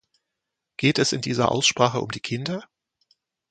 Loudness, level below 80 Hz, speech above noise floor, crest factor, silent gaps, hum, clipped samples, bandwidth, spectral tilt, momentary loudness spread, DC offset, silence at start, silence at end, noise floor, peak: -22 LUFS; -60 dBFS; 60 dB; 22 dB; none; none; under 0.1%; 9.4 kHz; -4 dB/octave; 12 LU; under 0.1%; 0.8 s; 0.85 s; -83 dBFS; -2 dBFS